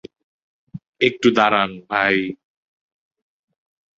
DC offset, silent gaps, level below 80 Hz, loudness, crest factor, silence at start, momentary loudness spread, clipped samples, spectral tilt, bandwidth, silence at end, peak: under 0.1%; 0.89-0.93 s; -60 dBFS; -18 LUFS; 20 dB; 0.75 s; 9 LU; under 0.1%; -5 dB/octave; 7.8 kHz; 1.65 s; -2 dBFS